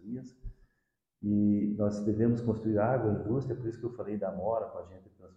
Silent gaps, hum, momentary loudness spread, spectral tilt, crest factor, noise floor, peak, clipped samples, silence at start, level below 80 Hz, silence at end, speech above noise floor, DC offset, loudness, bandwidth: none; none; 14 LU; -10 dB/octave; 16 dB; -81 dBFS; -16 dBFS; under 0.1%; 0.05 s; -56 dBFS; 0.1 s; 50 dB; under 0.1%; -31 LUFS; 7.8 kHz